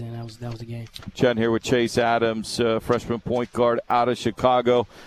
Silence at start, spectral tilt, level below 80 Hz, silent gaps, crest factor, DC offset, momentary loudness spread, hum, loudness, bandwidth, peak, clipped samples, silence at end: 0 s; -5.5 dB/octave; -50 dBFS; none; 18 dB; under 0.1%; 14 LU; none; -22 LUFS; 14 kHz; -6 dBFS; under 0.1%; 0 s